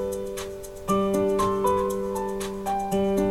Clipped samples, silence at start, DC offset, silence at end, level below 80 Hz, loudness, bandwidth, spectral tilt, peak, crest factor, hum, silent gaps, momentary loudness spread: under 0.1%; 0 s; under 0.1%; 0 s; -44 dBFS; -26 LUFS; 16 kHz; -6 dB/octave; -12 dBFS; 14 dB; none; none; 10 LU